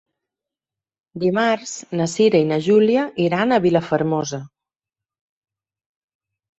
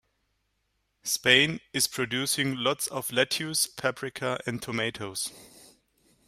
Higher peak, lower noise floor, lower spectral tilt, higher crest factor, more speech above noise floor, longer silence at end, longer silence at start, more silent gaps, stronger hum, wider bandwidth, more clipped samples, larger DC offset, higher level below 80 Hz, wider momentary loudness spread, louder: first, -2 dBFS vs -6 dBFS; first, -89 dBFS vs -76 dBFS; first, -5.5 dB/octave vs -2.5 dB/octave; second, 18 dB vs 24 dB; first, 71 dB vs 47 dB; first, 2.1 s vs 0.8 s; about the same, 1.15 s vs 1.05 s; neither; neither; second, 8.2 kHz vs 16 kHz; neither; neither; first, -60 dBFS vs -66 dBFS; second, 9 LU vs 12 LU; first, -19 LUFS vs -27 LUFS